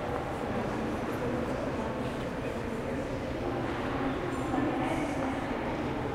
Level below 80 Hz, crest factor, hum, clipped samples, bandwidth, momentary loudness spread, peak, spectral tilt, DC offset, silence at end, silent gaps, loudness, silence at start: -46 dBFS; 16 dB; none; under 0.1%; 16 kHz; 4 LU; -16 dBFS; -6.5 dB/octave; under 0.1%; 0 s; none; -33 LUFS; 0 s